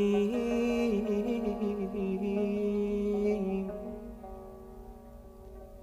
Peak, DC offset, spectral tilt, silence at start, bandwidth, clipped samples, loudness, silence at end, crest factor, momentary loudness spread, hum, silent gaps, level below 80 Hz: -18 dBFS; under 0.1%; -7.5 dB/octave; 0 s; 15 kHz; under 0.1%; -31 LUFS; 0 s; 14 dB; 21 LU; none; none; -52 dBFS